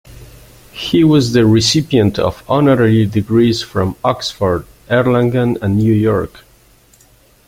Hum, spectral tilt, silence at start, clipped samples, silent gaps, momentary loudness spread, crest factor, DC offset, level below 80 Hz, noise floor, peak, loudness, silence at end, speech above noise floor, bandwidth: none; -6 dB/octave; 0.1 s; under 0.1%; none; 8 LU; 14 dB; under 0.1%; -42 dBFS; -49 dBFS; 0 dBFS; -14 LUFS; 1.2 s; 36 dB; 16 kHz